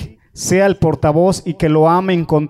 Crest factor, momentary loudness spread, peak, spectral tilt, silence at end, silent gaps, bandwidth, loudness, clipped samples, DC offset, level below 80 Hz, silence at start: 12 dB; 6 LU; -2 dBFS; -6 dB/octave; 0 s; none; 15 kHz; -14 LUFS; under 0.1%; under 0.1%; -38 dBFS; 0 s